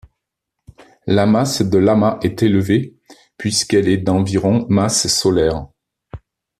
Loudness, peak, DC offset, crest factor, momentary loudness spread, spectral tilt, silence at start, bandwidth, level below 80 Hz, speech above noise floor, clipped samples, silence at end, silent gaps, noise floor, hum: -16 LUFS; -2 dBFS; under 0.1%; 14 dB; 5 LU; -5 dB/octave; 1.05 s; 14.5 kHz; -44 dBFS; 63 dB; under 0.1%; 0.45 s; none; -79 dBFS; none